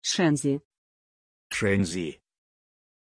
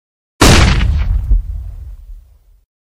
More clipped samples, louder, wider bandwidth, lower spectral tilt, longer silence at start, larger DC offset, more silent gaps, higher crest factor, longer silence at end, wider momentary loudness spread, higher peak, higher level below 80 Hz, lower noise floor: second, under 0.1% vs 0.2%; second, -27 LUFS vs -12 LUFS; second, 11 kHz vs 16 kHz; about the same, -4.5 dB/octave vs -4.5 dB/octave; second, 0.05 s vs 0.4 s; neither; first, 0.65-0.71 s, 0.78-1.50 s vs none; about the same, 18 dB vs 14 dB; first, 0.95 s vs 0.8 s; second, 10 LU vs 24 LU; second, -10 dBFS vs 0 dBFS; second, -60 dBFS vs -16 dBFS; first, under -90 dBFS vs -42 dBFS